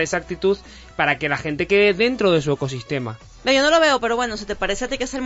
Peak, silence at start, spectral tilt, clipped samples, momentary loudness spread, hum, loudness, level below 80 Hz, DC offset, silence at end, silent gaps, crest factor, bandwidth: -4 dBFS; 0 s; -4 dB/octave; under 0.1%; 11 LU; none; -20 LUFS; -44 dBFS; under 0.1%; 0 s; none; 16 dB; 8 kHz